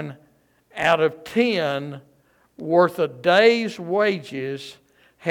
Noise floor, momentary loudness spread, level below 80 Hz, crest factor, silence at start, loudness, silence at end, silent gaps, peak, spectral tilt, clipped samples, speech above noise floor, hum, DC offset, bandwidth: -60 dBFS; 20 LU; -66 dBFS; 20 dB; 0 s; -21 LUFS; 0 s; none; -4 dBFS; -5.5 dB/octave; under 0.1%; 40 dB; none; under 0.1%; 16 kHz